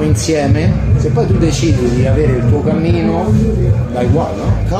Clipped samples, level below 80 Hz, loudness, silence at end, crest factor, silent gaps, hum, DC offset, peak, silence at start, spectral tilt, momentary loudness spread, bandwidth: under 0.1%; -22 dBFS; -13 LUFS; 0 s; 10 dB; none; none; under 0.1%; -2 dBFS; 0 s; -7 dB/octave; 2 LU; 12.5 kHz